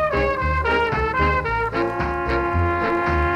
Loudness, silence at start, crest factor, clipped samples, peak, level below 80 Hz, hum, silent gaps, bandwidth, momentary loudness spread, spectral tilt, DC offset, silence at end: -21 LUFS; 0 s; 12 dB; under 0.1%; -8 dBFS; -30 dBFS; none; none; 9 kHz; 3 LU; -7.5 dB/octave; under 0.1%; 0 s